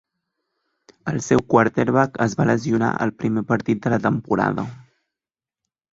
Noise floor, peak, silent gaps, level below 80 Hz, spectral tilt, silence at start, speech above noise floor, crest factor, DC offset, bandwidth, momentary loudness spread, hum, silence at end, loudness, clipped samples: under -90 dBFS; -2 dBFS; none; -54 dBFS; -7 dB/octave; 1.05 s; over 70 dB; 20 dB; under 0.1%; 8 kHz; 10 LU; none; 1.1 s; -20 LUFS; under 0.1%